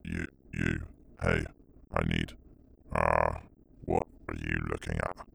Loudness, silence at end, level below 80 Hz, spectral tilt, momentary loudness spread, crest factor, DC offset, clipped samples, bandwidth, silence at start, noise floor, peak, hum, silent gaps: -33 LUFS; 0.05 s; -44 dBFS; -6.5 dB/octave; 12 LU; 22 dB; under 0.1%; under 0.1%; 12 kHz; 0.05 s; -57 dBFS; -10 dBFS; none; none